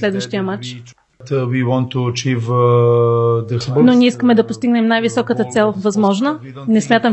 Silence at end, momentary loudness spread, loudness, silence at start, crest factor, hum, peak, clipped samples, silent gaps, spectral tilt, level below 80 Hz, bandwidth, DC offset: 0 s; 9 LU; -15 LUFS; 0 s; 14 dB; none; 0 dBFS; under 0.1%; none; -6.5 dB/octave; -58 dBFS; 8.4 kHz; under 0.1%